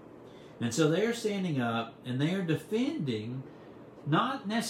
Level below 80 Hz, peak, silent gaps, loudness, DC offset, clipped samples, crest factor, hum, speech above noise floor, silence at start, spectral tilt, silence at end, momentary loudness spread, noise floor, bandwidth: -72 dBFS; -14 dBFS; none; -31 LUFS; under 0.1%; under 0.1%; 18 dB; none; 20 dB; 0 s; -5.5 dB/octave; 0 s; 22 LU; -50 dBFS; 16 kHz